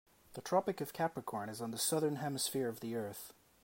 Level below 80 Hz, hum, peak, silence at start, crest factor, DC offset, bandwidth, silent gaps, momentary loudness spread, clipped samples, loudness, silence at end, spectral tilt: -78 dBFS; none; -18 dBFS; 0.3 s; 20 dB; under 0.1%; 16.5 kHz; none; 14 LU; under 0.1%; -38 LUFS; 0.35 s; -4 dB/octave